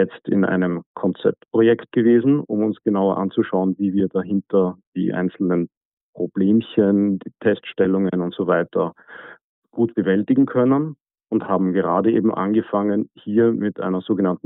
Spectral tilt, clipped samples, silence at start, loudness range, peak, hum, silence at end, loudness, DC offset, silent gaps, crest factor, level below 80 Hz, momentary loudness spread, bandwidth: -12.5 dB/octave; under 0.1%; 0 s; 2 LU; -4 dBFS; none; 0.1 s; -20 LUFS; under 0.1%; 0.86-0.94 s, 4.87-4.93 s, 5.77-6.13 s, 9.44-9.62 s; 14 dB; -64 dBFS; 8 LU; 4 kHz